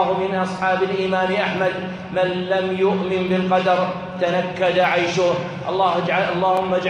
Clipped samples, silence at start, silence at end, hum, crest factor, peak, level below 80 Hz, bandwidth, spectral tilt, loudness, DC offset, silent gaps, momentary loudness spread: under 0.1%; 0 s; 0 s; none; 14 dB; -4 dBFS; -56 dBFS; 10 kHz; -6 dB/octave; -20 LUFS; under 0.1%; none; 5 LU